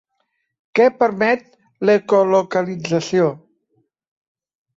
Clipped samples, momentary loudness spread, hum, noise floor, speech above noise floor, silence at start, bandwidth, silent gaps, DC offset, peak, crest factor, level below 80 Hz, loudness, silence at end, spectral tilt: under 0.1%; 7 LU; none; -71 dBFS; 55 dB; 0.75 s; 7.8 kHz; none; under 0.1%; -4 dBFS; 16 dB; -64 dBFS; -18 LUFS; 1.4 s; -6 dB/octave